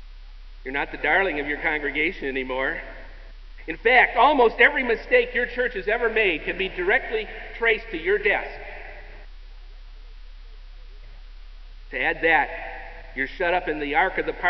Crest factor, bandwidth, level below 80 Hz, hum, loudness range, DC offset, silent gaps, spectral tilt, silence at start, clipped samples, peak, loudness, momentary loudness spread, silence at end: 22 dB; 6 kHz; -40 dBFS; none; 9 LU; under 0.1%; none; -6 dB/octave; 0 s; under 0.1%; -2 dBFS; -22 LUFS; 19 LU; 0 s